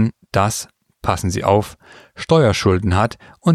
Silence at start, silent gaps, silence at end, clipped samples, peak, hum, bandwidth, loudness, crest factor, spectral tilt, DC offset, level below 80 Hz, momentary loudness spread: 0 s; none; 0 s; under 0.1%; -2 dBFS; none; 15 kHz; -18 LUFS; 16 dB; -6 dB/octave; under 0.1%; -40 dBFS; 12 LU